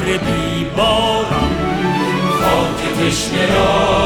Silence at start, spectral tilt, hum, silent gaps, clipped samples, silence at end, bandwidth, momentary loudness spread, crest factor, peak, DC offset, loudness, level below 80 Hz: 0 s; -4.5 dB/octave; none; none; under 0.1%; 0 s; over 20 kHz; 4 LU; 12 dB; -2 dBFS; under 0.1%; -15 LUFS; -30 dBFS